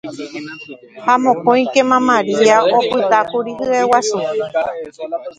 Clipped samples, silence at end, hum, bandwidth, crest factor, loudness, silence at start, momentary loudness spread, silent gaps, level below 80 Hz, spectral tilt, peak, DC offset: under 0.1%; 0.05 s; none; 10.5 kHz; 16 dB; -15 LUFS; 0.05 s; 16 LU; none; -60 dBFS; -4 dB/octave; 0 dBFS; under 0.1%